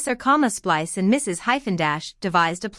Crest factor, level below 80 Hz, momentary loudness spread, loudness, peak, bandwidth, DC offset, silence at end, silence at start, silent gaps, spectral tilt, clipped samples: 16 dB; -56 dBFS; 4 LU; -21 LUFS; -6 dBFS; 12 kHz; under 0.1%; 0 s; 0 s; none; -4 dB/octave; under 0.1%